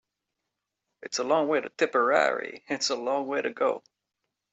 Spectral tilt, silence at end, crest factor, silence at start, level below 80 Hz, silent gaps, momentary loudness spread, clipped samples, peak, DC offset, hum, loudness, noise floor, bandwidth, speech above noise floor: -2.5 dB/octave; 0.75 s; 20 dB; 1 s; -80 dBFS; none; 11 LU; under 0.1%; -8 dBFS; under 0.1%; none; -27 LUFS; -84 dBFS; 8.2 kHz; 58 dB